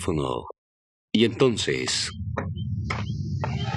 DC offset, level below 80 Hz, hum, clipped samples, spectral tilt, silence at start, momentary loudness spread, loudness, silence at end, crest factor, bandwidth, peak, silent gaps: under 0.1%; -48 dBFS; none; under 0.1%; -5 dB/octave; 0 s; 10 LU; -26 LUFS; 0 s; 20 dB; 12 kHz; -6 dBFS; 0.58-1.08 s